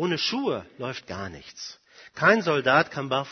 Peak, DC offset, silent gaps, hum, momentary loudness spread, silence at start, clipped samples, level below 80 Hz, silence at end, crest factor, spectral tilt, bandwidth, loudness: -4 dBFS; under 0.1%; none; none; 18 LU; 0 s; under 0.1%; -64 dBFS; 0 s; 22 dB; -4.5 dB/octave; 6.6 kHz; -24 LUFS